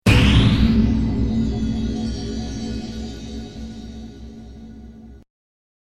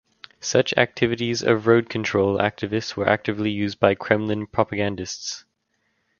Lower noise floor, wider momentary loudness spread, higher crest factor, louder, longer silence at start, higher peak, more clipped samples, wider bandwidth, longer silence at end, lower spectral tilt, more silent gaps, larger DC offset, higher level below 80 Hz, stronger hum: second, -40 dBFS vs -71 dBFS; first, 24 LU vs 10 LU; about the same, 20 dB vs 22 dB; about the same, -20 LUFS vs -22 LUFS; second, 0.05 s vs 0.4 s; about the same, -2 dBFS vs 0 dBFS; neither; first, 13 kHz vs 7.2 kHz; about the same, 0.8 s vs 0.8 s; first, -6.5 dB/octave vs -5 dB/octave; neither; neither; first, -26 dBFS vs -52 dBFS; neither